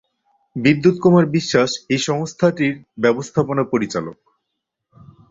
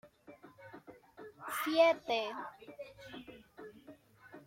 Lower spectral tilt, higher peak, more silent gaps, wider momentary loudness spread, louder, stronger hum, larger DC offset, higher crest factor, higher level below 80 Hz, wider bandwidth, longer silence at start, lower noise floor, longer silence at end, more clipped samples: first, -6 dB/octave vs -3 dB/octave; first, -2 dBFS vs -16 dBFS; neither; second, 8 LU vs 27 LU; first, -18 LUFS vs -33 LUFS; neither; neither; about the same, 18 dB vs 22 dB; first, -56 dBFS vs -76 dBFS; second, 7.8 kHz vs 16.5 kHz; first, 0.55 s vs 0.05 s; first, -78 dBFS vs -58 dBFS; first, 1.2 s vs 0.05 s; neither